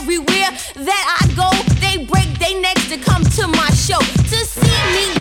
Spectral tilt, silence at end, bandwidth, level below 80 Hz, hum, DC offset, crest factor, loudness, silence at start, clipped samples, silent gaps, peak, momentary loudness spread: -4 dB/octave; 0 s; 19 kHz; -26 dBFS; none; under 0.1%; 14 dB; -15 LUFS; 0 s; under 0.1%; none; 0 dBFS; 3 LU